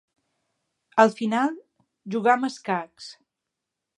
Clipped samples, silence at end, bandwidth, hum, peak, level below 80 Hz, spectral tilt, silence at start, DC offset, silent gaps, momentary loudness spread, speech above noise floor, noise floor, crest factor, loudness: under 0.1%; 0.85 s; 11 kHz; none; -2 dBFS; -80 dBFS; -5 dB/octave; 0.95 s; under 0.1%; none; 22 LU; 62 dB; -85 dBFS; 24 dB; -23 LUFS